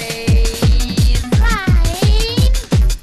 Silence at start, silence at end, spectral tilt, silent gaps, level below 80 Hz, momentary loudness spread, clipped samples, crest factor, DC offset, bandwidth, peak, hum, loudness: 0 s; 0 s; -5 dB/octave; none; -14 dBFS; 1 LU; under 0.1%; 8 dB; 0.3%; 13.5 kHz; -6 dBFS; none; -15 LUFS